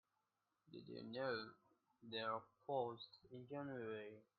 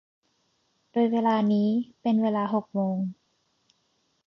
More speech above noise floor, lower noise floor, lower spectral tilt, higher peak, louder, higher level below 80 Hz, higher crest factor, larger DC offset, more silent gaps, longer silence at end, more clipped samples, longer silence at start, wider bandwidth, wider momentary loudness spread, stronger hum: second, 40 dB vs 47 dB; first, -89 dBFS vs -72 dBFS; second, -3 dB/octave vs -9 dB/octave; second, -30 dBFS vs -12 dBFS; second, -49 LUFS vs -26 LUFS; second, -90 dBFS vs -78 dBFS; about the same, 20 dB vs 16 dB; neither; neither; second, 0.15 s vs 1.15 s; neither; second, 0.7 s vs 0.95 s; second, 4.9 kHz vs 6 kHz; first, 14 LU vs 8 LU; neither